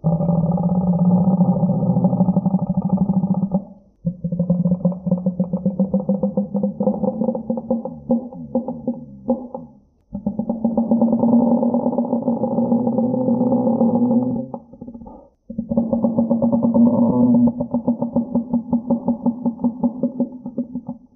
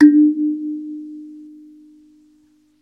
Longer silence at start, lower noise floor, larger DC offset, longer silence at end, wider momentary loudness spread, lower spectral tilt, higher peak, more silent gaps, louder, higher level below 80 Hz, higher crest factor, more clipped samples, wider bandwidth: about the same, 0.05 s vs 0 s; second, -46 dBFS vs -56 dBFS; neither; second, 0.2 s vs 1.4 s; second, 12 LU vs 26 LU; first, -18.5 dB/octave vs -7 dB/octave; second, -4 dBFS vs 0 dBFS; neither; second, -20 LUFS vs -17 LUFS; first, -48 dBFS vs -76 dBFS; about the same, 16 dB vs 18 dB; neither; second, 1.4 kHz vs 2.1 kHz